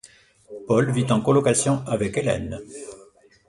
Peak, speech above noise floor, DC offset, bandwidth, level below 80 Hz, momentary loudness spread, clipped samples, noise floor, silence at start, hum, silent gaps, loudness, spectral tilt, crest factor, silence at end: -6 dBFS; 31 dB; under 0.1%; 11.5 kHz; -50 dBFS; 21 LU; under 0.1%; -53 dBFS; 0.5 s; none; none; -22 LUFS; -5.5 dB/octave; 18 dB; 0.45 s